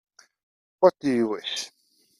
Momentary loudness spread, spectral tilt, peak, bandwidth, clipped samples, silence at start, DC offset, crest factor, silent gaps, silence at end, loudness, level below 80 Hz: 11 LU; -4.5 dB/octave; -4 dBFS; 12 kHz; under 0.1%; 0.8 s; under 0.1%; 24 dB; none; 0.5 s; -24 LUFS; -70 dBFS